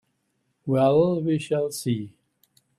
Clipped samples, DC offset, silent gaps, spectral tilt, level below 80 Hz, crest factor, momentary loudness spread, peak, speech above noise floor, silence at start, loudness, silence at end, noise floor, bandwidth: under 0.1%; under 0.1%; none; -7 dB/octave; -62 dBFS; 18 dB; 13 LU; -8 dBFS; 51 dB; 0.65 s; -23 LUFS; 0.7 s; -73 dBFS; 14 kHz